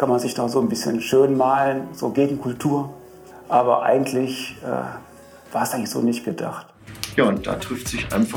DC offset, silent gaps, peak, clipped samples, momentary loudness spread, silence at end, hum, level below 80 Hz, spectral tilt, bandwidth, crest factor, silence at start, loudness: under 0.1%; none; -2 dBFS; under 0.1%; 13 LU; 0 s; none; -50 dBFS; -5 dB/octave; 20 kHz; 20 dB; 0 s; -22 LUFS